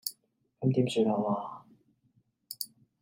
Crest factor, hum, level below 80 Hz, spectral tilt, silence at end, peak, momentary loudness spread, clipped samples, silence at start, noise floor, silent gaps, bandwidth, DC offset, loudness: 20 dB; none; -78 dBFS; -6.5 dB/octave; 0.35 s; -14 dBFS; 17 LU; under 0.1%; 0.05 s; -71 dBFS; none; 16 kHz; under 0.1%; -31 LUFS